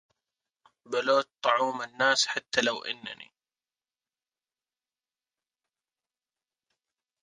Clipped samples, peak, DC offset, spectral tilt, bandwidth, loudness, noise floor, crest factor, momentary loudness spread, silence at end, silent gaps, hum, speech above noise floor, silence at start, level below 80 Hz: under 0.1%; -6 dBFS; under 0.1%; -1.5 dB/octave; 10.5 kHz; -27 LUFS; under -90 dBFS; 26 dB; 13 LU; 4 s; none; none; over 62 dB; 0.9 s; -78 dBFS